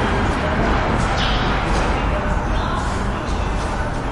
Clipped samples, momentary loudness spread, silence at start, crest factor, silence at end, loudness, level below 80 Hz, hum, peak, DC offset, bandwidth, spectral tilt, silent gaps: under 0.1%; 4 LU; 0 s; 14 dB; 0 s; -20 LUFS; -24 dBFS; none; -6 dBFS; under 0.1%; 11.5 kHz; -5.5 dB/octave; none